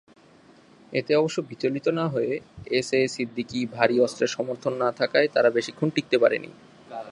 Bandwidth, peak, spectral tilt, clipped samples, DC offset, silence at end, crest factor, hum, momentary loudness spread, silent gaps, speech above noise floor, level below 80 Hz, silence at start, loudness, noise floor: 11.5 kHz; -2 dBFS; -5 dB/octave; under 0.1%; under 0.1%; 0 s; 22 dB; none; 9 LU; none; 30 dB; -64 dBFS; 0.9 s; -25 LUFS; -54 dBFS